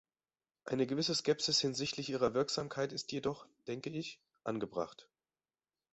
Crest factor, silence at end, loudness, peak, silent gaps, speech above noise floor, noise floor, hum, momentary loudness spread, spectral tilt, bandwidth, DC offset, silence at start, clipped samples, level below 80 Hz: 20 dB; 0.9 s; -36 LUFS; -18 dBFS; none; over 53 dB; under -90 dBFS; none; 14 LU; -4 dB/octave; 8.2 kHz; under 0.1%; 0.65 s; under 0.1%; -72 dBFS